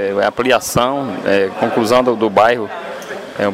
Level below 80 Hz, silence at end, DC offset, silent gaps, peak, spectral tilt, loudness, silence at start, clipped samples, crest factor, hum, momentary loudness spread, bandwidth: -48 dBFS; 0 s; under 0.1%; none; -2 dBFS; -4.5 dB/octave; -15 LUFS; 0 s; under 0.1%; 14 dB; none; 14 LU; 16 kHz